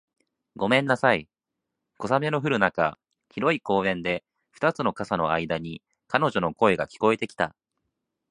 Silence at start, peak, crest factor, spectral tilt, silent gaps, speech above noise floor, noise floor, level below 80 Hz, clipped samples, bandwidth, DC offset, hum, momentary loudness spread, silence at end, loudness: 0.55 s; -2 dBFS; 24 dB; -6 dB/octave; none; 60 dB; -84 dBFS; -58 dBFS; under 0.1%; 11 kHz; under 0.1%; none; 8 LU; 0.8 s; -25 LUFS